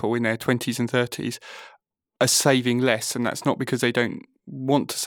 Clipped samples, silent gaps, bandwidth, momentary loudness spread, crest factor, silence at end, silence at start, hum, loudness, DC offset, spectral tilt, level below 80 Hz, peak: under 0.1%; none; 19.5 kHz; 16 LU; 20 dB; 0 s; 0 s; none; -23 LUFS; under 0.1%; -4 dB/octave; -68 dBFS; -4 dBFS